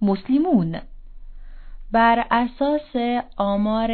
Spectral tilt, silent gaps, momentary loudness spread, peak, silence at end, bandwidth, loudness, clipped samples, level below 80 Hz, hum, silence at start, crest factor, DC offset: -10.5 dB/octave; none; 7 LU; -4 dBFS; 0 s; 4.6 kHz; -21 LUFS; under 0.1%; -40 dBFS; none; 0 s; 16 dB; under 0.1%